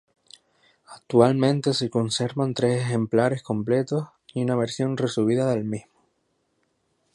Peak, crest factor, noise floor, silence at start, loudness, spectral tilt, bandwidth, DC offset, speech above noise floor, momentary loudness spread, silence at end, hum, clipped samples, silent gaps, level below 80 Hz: -4 dBFS; 20 dB; -71 dBFS; 0.9 s; -24 LUFS; -6 dB/octave; 11.5 kHz; under 0.1%; 48 dB; 9 LU; 1.35 s; none; under 0.1%; none; -64 dBFS